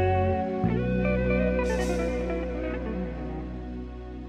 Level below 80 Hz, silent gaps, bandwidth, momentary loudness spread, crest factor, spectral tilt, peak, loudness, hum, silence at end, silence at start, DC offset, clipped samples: -36 dBFS; none; 12 kHz; 12 LU; 14 dB; -7.5 dB/octave; -14 dBFS; -28 LUFS; 60 Hz at -40 dBFS; 0 s; 0 s; under 0.1%; under 0.1%